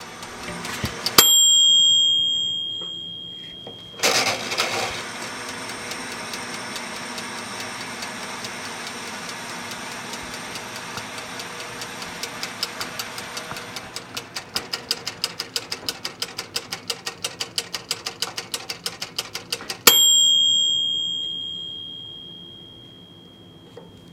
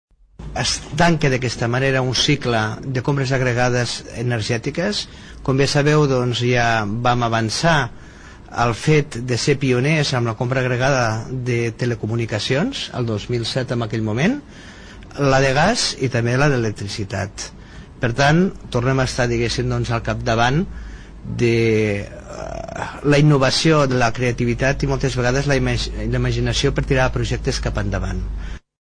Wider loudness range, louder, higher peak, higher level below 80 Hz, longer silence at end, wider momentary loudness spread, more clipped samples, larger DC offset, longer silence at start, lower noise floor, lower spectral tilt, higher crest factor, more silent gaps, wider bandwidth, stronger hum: first, 15 LU vs 3 LU; about the same, -21 LUFS vs -19 LUFS; first, 0 dBFS vs -4 dBFS; second, -58 dBFS vs -34 dBFS; second, 0 s vs 0.25 s; first, 19 LU vs 12 LU; neither; neither; second, 0 s vs 0.4 s; first, -46 dBFS vs -39 dBFS; second, 0 dB/octave vs -5 dB/octave; first, 24 dB vs 16 dB; neither; first, 17.5 kHz vs 10.5 kHz; neither